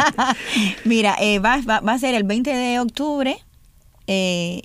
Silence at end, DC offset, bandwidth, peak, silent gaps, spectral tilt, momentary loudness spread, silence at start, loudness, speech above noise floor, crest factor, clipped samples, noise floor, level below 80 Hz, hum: 0.05 s; under 0.1%; 15.5 kHz; -2 dBFS; none; -4 dB/octave; 6 LU; 0 s; -19 LUFS; 32 dB; 18 dB; under 0.1%; -51 dBFS; -44 dBFS; none